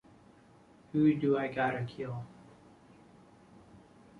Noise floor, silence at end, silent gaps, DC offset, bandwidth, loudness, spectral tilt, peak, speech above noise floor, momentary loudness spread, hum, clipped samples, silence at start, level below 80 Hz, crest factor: -60 dBFS; 0.45 s; none; under 0.1%; 6.6 kHz; -32 LUFS; -8.5 dB/octave; -16 dBFS; 29 dB; 15 LU; none; under 0.1%; 0.95 s; -68 dBFS; 20 dB